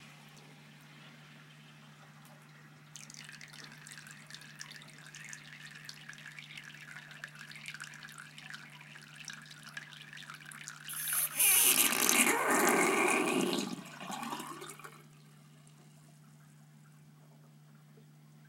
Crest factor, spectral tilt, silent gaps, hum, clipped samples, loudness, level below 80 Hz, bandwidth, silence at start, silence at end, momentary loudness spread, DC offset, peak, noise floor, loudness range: 32 dB; -1.5 dB/octave; none; none; under 0.1%; -29 LUFS; -86 dBFS; 17 kHz; 0 s; 3.5 s; 26 LU; under 0.1%; -6 dBFS; -58 dBFS; 24 LU